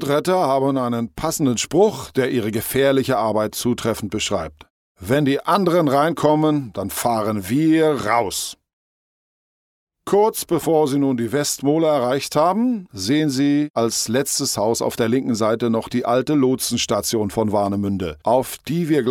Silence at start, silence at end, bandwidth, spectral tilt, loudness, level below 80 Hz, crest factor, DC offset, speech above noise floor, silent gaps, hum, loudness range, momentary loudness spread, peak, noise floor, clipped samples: 0 s; 0 s; 17 kHz; -5 dB/octave; -19 LUFS; -52 dBFS; 18 dB; under 0.1%; over 71 dB; 4.70-4.95 s, 8.73-9.87 s, 13.70-13.74 s; none; 3 LU; 6 LU; -2 dBFS; under -90 dBFS; under 0.1%